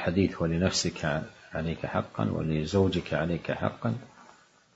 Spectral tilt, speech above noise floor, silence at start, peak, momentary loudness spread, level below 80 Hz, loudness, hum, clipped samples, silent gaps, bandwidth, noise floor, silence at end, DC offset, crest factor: -5.5 dB/octave; 29 dB; 0 s; -10 dBFS; 8 LU; -50 dBFS; -29 LUFS; none; under 0.1%; none; 8 kHz; -58 dBFS; 0.5 s; under 0.1%; 20 dB